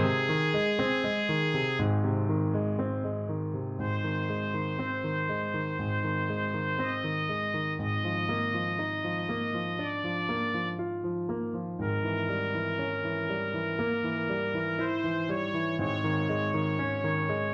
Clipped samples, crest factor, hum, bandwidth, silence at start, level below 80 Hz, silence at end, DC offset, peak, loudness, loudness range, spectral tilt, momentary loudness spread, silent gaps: under 0.1%; 16 dB; none; 7.4 kHz; 0 s; -60 dBFS; 0 s; under 0.1%; -14 dBFS; -30 LUFS; 3 LU; -7.5 dB/octave; 5 LU; none